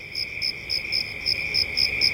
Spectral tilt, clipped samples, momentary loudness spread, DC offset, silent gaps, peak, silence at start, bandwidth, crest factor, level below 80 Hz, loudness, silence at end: -1.5 dB/octave; under 0.1%; 7 LU; under 0.1%; none; -8 dBFS; 0 s; 17 kHz; 18 dB; -48 dBFS; -23 LUFS; 0 s